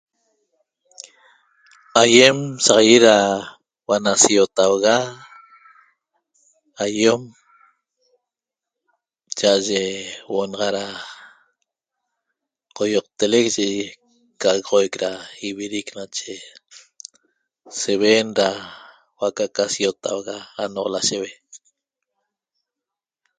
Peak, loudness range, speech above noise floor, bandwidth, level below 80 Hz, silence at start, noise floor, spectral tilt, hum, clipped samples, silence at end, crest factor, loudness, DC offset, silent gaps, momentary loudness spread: 0 dBFS; 11 LU; 68 dB; 10 kHz; -64 dBFS; 1.95 s; -87 dBFS; -2.5 dB/octave; none; under 0.1%; 1.8 s; 22 dB; -18 LUFS; under 0.1%; none; 20 LU